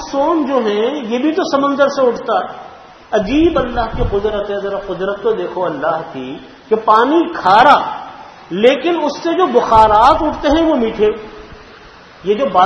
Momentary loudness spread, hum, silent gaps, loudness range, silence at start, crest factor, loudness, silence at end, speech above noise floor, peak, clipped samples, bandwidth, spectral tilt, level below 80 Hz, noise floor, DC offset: 15 LU; none; none; 6 LU; 0 s; 14 dB; -14 LUFS; 0 s; 26 dB; 0 dBFS; 0.1%; 8.8 kHz; -5.5 dB/octave; -34 dBFS; -39 dBFS; under 0.1%